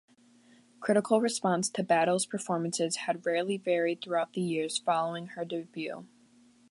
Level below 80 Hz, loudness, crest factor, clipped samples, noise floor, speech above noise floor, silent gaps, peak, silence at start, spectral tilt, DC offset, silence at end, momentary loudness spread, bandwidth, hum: -82 dBFS; -30 LUFS; 18 dB; under 0.1%; -61 dBFS; 31 dB; none; -12 dBFS; 0.8 s; -4 dB/octave; under 0.1%; 0.65 s; 11 LU; 11.5 kHz; none